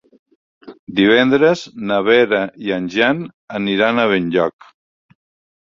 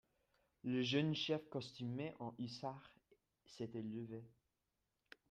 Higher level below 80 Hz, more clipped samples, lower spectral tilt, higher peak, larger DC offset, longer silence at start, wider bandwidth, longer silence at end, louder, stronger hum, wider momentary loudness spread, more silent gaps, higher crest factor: first, -58 dBFS vs -82 dBFS; neither; about the same, -6 dB/octave vs -6 dB/octave; first, -2 dBFS vs -26 dBFS; neither; about the same, 0.65 s vs 0.65 s; second, 7.6 kHz vs 9.6 kHz; first, 1.2 s vs 1 s; first, -16 LUFS vs -44 LUFS; neither; second, 10 LU vs 14 LU; first, 0.79-0.87 s, 3.34-3.48 s vs none; about the same, 16 dB vs 20 dB